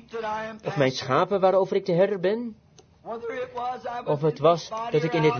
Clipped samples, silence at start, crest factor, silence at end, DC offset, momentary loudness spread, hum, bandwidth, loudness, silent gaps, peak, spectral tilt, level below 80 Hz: under 0.1%; 0.1 s; 18 dB; 0 s; under 0.1%; 11 LU; none; 6.8 kHz; -25 LUFS; none; -6 dBFS; -6.5 dB/octave; -64 dBFS